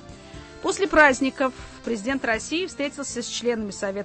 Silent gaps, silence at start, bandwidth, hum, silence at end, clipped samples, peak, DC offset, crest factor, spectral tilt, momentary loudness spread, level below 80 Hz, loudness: none; 0 s; 8.8 kHz; none; 0 s; under 0.1%; -4 dBFS; under 0.1%; 20 dB; -3 dB/octave; 16 LU; -48 dBFS; -23 LUFS